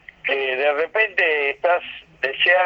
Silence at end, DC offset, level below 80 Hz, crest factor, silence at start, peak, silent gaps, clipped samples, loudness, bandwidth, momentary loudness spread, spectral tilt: 0 s; under 0.1%; -62 dBFS; 16 dB; 0.25 s; -4 dBFS; none; under 0.1%; -20 LUFS; 6.4 kHz; 8 LU; -3.5 dB/octave